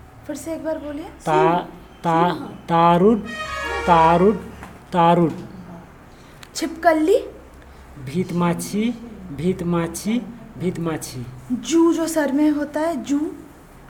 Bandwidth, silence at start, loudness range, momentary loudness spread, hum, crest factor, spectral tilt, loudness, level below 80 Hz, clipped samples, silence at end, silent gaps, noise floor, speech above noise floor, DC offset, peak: 17.5 kHz; 0.15 s; 6 LU; 18 LU; none; 20 dB; -6 dB/octave; -20 LUFS; -46 dBFS; under 0.1%; 0.05 s; none; -44 dBFS; 24 dB; under 0.1%; 0 dBFS